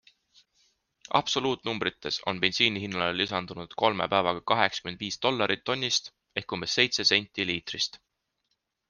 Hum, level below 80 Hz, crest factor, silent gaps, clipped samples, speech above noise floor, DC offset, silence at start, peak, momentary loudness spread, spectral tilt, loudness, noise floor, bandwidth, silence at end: none; -64 dBFS; 26 dB; none; under 0.1%; 51 dB; under 0.1%; 1.1 s; -4 dBFS; 8 LU; -3 dB/octave; -27 LUFS; -79 dBFS; 10.5 kHz; 0.95 s